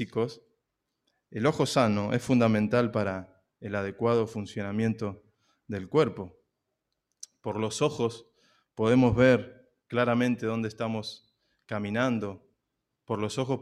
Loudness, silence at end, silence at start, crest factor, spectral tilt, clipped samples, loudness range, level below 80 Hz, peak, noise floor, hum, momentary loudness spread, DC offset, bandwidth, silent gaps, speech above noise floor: -28 LUFS; 0 s; 0 s; 20 dB; -6.5 dB/octave; under 0.1%; 6 LU; -60 dBFS; -10 dBFS; -83 dBFS; none; 17 LU; under 0.1%; 12.5 kHz; none; 55 dB